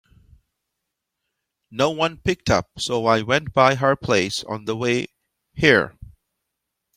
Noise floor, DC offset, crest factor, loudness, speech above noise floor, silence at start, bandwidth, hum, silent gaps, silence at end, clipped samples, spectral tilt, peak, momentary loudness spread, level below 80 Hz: -81 dBFS; under 0.1%; 22 dB; -20 LUFS; 60 dB; 1.7 s; 16 kHz; none; none; 0.9 s; under 0.1%; -4.5 dB/octave; -2 dBFS; 11 LU; -50 dBFS